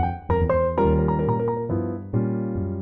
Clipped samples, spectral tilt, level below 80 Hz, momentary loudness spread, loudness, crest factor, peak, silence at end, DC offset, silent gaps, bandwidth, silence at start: under 0.1%; -11.5 dB/octave; -34 dBFS; 6 LU; -23 LUFS; 14 dB; -8 dBFS; 0 s; under 0.1%; none; 4.1 kHz; 0 s